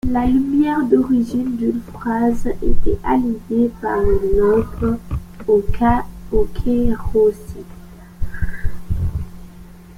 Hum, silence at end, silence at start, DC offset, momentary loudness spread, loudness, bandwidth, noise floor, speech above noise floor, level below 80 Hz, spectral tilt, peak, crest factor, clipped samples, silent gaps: none; 0.05 s; 0.05 s; under 0.1%; 14 LU; -19 LUFS; 12 kHz; -39 dBFS; 23 dB; -26 dBFS; -8.5 dB/octave; -2 dBFS; 14 dB; under 0.1%; none